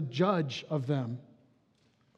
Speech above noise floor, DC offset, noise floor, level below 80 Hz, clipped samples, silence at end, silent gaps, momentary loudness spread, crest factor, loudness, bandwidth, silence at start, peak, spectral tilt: 38 dB; under 0.1%; -69 dBFS; -86 dBFS; under 0.1%; 0.95 s; none; 11 LU; 20 dB; -32 LUFS; 8.2 kHz; 0 s; -14 dBFS; -7 dB/octave